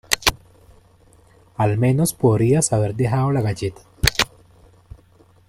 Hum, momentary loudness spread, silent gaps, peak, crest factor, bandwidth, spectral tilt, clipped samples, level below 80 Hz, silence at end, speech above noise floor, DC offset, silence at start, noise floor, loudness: none; 7 LU; none; 0 dBFS; 22 dB; 16.5 kHz; -4.5 dB/octave; under 0.1%; -38 dBFS; 1.25 s; 34 dB; under 0.1%; 0.1 s; -53 dBFS; -19 LUFS